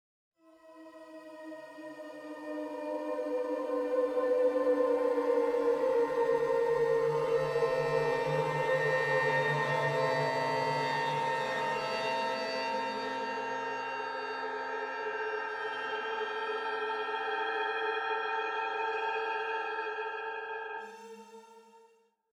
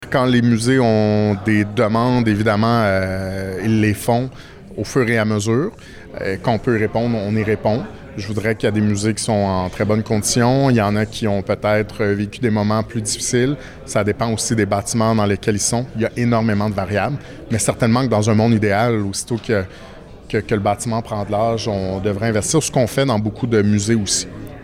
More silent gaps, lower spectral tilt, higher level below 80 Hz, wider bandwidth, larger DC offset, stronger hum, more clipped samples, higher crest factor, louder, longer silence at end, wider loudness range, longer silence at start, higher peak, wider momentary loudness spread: neither; about the same, -5 dB/octave vs -5.5 dB/octave; second, -70 dBFS vs -44 dBFS; second, 13.5 kHz vs 15.5 kHz; neither; neither; neither; about the same, 14 dB vs 12 dB; second, -32 LUFS vs -18 LUFS; first, 0.6 s vs 0 s; first, 7 LU vs 3 LU; first, 0.65 s vs 0 s; second, -18 dBFS vs -4 dBFS; first, 15 LU vs 8 LU